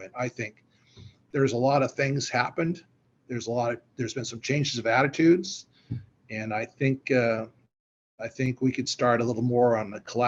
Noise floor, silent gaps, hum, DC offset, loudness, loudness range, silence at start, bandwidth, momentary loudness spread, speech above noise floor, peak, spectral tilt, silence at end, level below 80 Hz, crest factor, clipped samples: -52 dBFS; 7.80-8.18 s; none; under 0.1%; -27 LUFS; 3 LU; 0 s; 8 kHz; 15 LU; 26 dB; -8 dBFS; -5.5 dB/octave; 0 s; -66 dBFS; 18 dB; under 0.1%